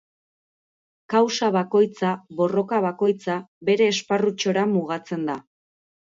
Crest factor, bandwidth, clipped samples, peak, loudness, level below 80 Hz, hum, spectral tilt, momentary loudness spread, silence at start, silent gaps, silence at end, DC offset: 16 dB; 7.8 kHz; under 0.1%; -8 dBFS; -23 LUFS; -72 dBFS; none; -5 dB/octave; 8 LU; 1.1 s; 3.48-3.61 s; 0.65 s; under 0.1%